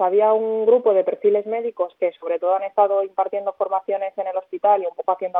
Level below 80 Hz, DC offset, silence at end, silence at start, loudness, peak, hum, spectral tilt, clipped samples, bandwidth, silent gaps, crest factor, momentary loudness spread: -82 dBFS; under 0.1%; 0 s; 0 s; -21 LUFS; -4 dBFS; none; -8.5 dB/octave; under 0.1%; 3.9 kHz; none; 16 dB; 8 LU